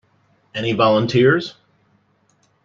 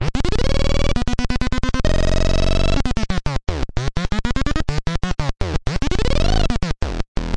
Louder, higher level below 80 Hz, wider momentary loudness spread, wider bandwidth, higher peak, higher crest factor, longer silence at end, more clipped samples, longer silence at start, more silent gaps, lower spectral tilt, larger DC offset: first, -17 LUFS vs -22 LUFS; second, -58 dBFS vs -20 dBFS; first, 15 LU vs 5 LU; second, 7.4 kHz vs 9.6 kHz; about the same, -2 dBFS vs -4 dBFS; about the same, 18 dB vs 14 dB; first, 1.15 s vs 0 s; neither; first, 0.55 s vs 0 s; second, none vs 7.08-7.15 s; about the same, -6.5 dB/octave vs -5.5 dB/octave; neither